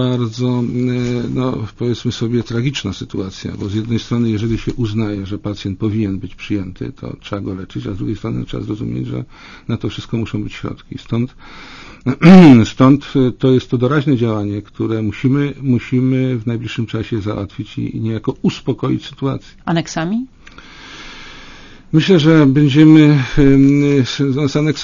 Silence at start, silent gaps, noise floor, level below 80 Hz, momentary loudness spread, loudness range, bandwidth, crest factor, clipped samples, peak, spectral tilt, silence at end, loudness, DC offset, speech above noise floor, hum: 0 s; none; -38 dBFS; -38 dBFS; 16 LU; 12 LU; 7.4 kHz; 14 dB; 0.3%; 0 dBFS; -7.5 dB/octave; 0 s; -15 LUFS; under 0.1%; 23 dB; none